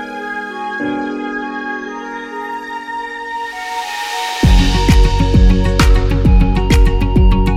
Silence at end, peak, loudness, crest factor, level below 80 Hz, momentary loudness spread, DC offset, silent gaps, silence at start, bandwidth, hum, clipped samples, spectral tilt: 0 s; 0 dBFS; -16 LUFS; 12 dB; -16 dBFS; 12 LU; under 0.1%; none; 0 s; 13.5 kHz; none; under 0.1%; -6 dB/octave